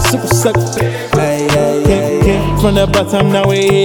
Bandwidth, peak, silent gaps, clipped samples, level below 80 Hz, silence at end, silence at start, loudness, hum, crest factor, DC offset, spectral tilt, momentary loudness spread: 20 kHz; 0 dBFS; none; under 0.1%; -26 dBFS; 0 s; 0 s; -12 LUFS; none; 12 dB; under 0.1%; -5.5 dB/octave; 3 LU